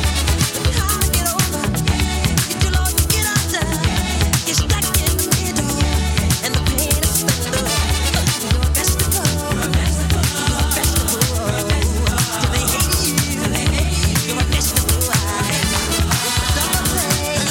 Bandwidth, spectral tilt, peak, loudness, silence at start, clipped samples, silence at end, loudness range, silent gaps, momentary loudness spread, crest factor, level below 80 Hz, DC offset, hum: 19 kHz; -3.5 dB/octave; -2 dBFS; -17 LUFS; 0 s; under 0.1%; 0 s; 1 LU; none; 2 LU; 14 dB; -22 dBFS; under 0.1%; none